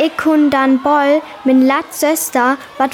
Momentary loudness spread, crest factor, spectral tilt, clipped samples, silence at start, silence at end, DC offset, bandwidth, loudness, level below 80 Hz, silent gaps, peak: 4 LU; 10 dB; -3 dB/octave; under 0.1%; 0 s; 0 s; under 0.1%; 18 kHz; -13 LUFS; -58 dBFS; none; -2 dBFS